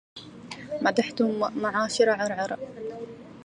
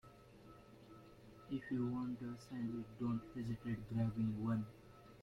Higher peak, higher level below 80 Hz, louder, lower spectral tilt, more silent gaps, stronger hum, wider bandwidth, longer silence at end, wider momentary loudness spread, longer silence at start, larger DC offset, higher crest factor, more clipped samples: first, -8 dBFS vs -28 dBFS; about the same, -66 dBFS vs -66 dBFS; first, -27 LUFS vs -43 LUFS; second, -4 dB/octave vs -8.5 dB/octave; neither; neither; second, 10.5 kHz vs 13 kHz; about the same, 0 s vs 0 s; second, 18 LU vs 21 LU; about the same, 0.15 s vs 0.05 s; neither; about the same, 20 dB vs 16 dB; neither